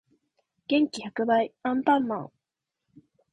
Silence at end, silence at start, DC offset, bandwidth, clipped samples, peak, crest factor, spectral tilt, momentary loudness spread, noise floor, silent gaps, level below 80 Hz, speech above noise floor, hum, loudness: 1.05 s; 0.7 s; under 0.1%; 10.5 kHz; under 0.1%; -10 dBFS; 20 dB; -5 dB/octave; 12 LU; -86 dBFS; none; -72 dBFS; 61 dB; none; -26 LUFS